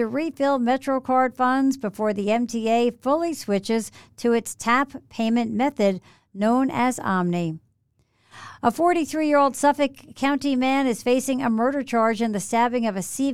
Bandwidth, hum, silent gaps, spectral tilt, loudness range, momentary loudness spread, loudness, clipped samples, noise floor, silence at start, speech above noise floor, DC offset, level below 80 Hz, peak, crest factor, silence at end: 15 kHz; none; none; -5 dB/octave; 2 LU; 6 LU; -23 LUFS; under 0.1%; -67 dBFS; 0 s; 44 dB; 0.3%; -62 dBFS; -6 dBFS; 16 dB; 0 s